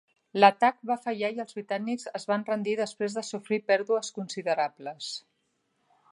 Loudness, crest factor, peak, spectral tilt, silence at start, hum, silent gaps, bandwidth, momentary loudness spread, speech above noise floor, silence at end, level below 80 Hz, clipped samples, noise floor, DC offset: -28 LUFS; 24 dB; -4 dBFS; -4 dB/octave; 0.35 s; none; none; 11.5 kHz; 15 LU; 47 dB; 0.95 s; -84 dBFS; under 0.1%; -75 dBFS; under 0.1%